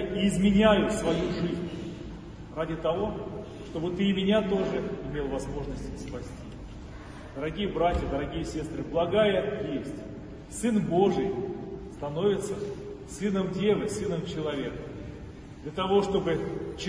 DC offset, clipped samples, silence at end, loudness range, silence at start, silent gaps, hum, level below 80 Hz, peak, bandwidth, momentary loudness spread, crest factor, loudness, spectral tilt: under 0.1%; under 0.1%; 0 s; 5 LU; 0 s; none; none; -44 dBFS; -8 dBFS; 10.5 kHz; 17 LU; 20 dB; -29 LUFS; -6 dB/octave